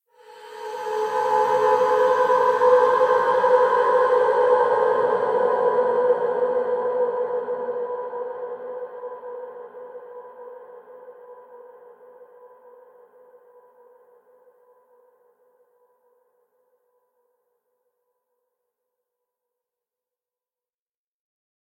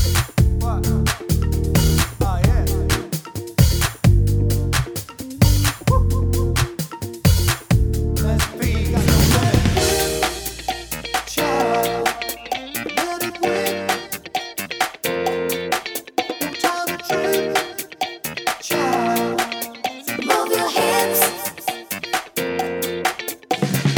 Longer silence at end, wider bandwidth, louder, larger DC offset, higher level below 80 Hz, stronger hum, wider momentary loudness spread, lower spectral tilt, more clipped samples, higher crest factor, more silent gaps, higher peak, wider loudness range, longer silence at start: first, 9.3 s vs 0 s; second, 9 kHz vs over 20 kHz; about the same, -20 LUFS vs -20 LUFS; neither; second, -74 dBFS vs -26 dBFS; neither; first, 22 LU vs 9 LU; about the same, -4.5 dB/octave vs -4.5 dB/octave; neither; about the same, 18 dB vs 20 dB; neither; second, -6 dBFS vs 0 dBFS; first, 21 LU vs 4 LU; first, 0.3 s vs 0 s